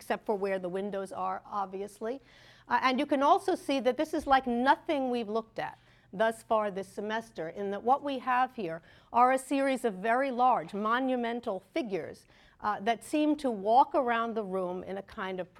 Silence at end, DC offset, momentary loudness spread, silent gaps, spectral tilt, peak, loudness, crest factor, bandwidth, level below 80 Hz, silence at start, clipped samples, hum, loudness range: 0.15 s; under 0.1%; 12 LU; none; -5 dB/octave; -12 dBFS; -30 LUFS; 18 dB; 14.5 kHz; -66 dBFS; 0 s; under 0.1%; none; 3 LU